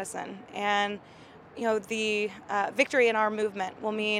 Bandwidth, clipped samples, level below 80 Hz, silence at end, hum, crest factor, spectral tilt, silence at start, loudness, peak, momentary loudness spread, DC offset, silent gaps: 15 kHz; under 0.1%; -72 dBFS; 0 s; none; 20 dB; -3.5 dB/octave; 0 s; -28 LUFS; -10 dBFS; 14 LU; under 0.1%; none